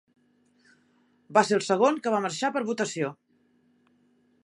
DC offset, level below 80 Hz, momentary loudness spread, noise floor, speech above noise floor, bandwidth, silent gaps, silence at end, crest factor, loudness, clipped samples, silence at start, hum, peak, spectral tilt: under 0.1%; -82 dBFS; 7 LU; -66 dBFS; 41 dB; 11.5 kHz; none; 1.35 s; 24 dB; -26 LUFS; under 0.1%; 1.3 s; none; -6 dBFS; -4 dB/octave